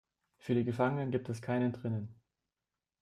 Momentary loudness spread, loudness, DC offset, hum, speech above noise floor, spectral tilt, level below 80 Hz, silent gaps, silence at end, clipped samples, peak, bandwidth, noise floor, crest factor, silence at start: 9 LU; -35 LUFS; under 0.1%; none; over 56 dB; -8 dB/octave; -70 dBFS; none; 0.9 s; under 0.1%; -16 dBFS; 12 kHz; under -90 dBFS; 20 dB; 0.45 s